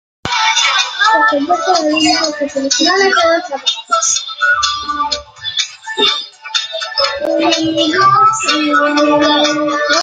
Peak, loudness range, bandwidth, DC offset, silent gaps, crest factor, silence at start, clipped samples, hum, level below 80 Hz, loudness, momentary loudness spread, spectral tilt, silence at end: 0 dBFS; 3 LU; 9.6 kHz; under 0.1%; none; 14 dB; 0.25 s; under 0.1%; none; -52 dBFS; -12 LUFS; 8 LU; -1.5 dB/octave; 0 s